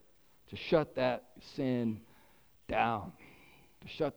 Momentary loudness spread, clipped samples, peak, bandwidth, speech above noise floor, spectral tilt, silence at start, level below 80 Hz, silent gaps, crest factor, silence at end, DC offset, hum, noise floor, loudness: 18 LU; under 0.1%; -14 dBFS; over 20 kHz; 33 dB; -7 dB/octave; 0.5 s; -62 dBFS; none; 22 dB; 0.05 s; under 0.1%; none; -66 dBFS; -34 LUFS